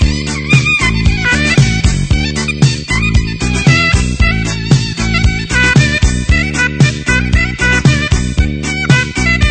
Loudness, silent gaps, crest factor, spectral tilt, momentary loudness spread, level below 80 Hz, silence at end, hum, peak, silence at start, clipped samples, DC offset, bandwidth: -11 LUFS; none; 12 dB; -4.5 dB/octave; 5 LU; -18 dBFS; 0 s; none; 0 dBFS; 0 s; 0.2%; under 0.1%; 9.2 kHz